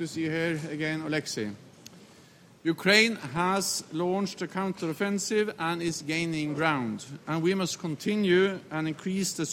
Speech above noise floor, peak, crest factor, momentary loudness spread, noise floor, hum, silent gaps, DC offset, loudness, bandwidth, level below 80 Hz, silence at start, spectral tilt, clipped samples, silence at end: 26 dB; -6 dBFS; 22 dB; 9 LU; -55 dBFS; none; none; under 0.1%; -28 LUFS; 16 kHz; -68 dBFS; 0 s; -4 dB/octave; under 0.1%; 0 s